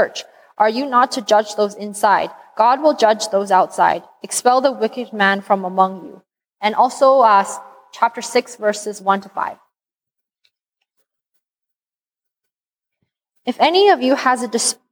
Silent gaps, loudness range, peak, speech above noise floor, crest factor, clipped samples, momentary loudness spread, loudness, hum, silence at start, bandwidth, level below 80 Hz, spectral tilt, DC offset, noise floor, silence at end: none; 9 LU; -2 dBFS; over 74 dB; 16 dB; under 0.1%; 12 LU; -17 LUFS; none; 0 s; 19.5 kHz; -74 dBFS; -3 dB/octave; under 0.1%; under -90 dBFS; 0.2 s